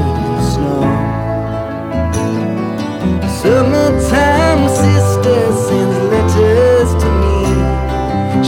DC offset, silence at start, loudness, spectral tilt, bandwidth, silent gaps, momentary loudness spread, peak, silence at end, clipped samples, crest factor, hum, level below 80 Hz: under 0.1%; 0 s; -13 LUFS; -6.5 dB/octave; 16.5 kHz; none; 8 LU; 0 dBFS; 0 s; under 0.1%; 12 dB; none; -22 dBFS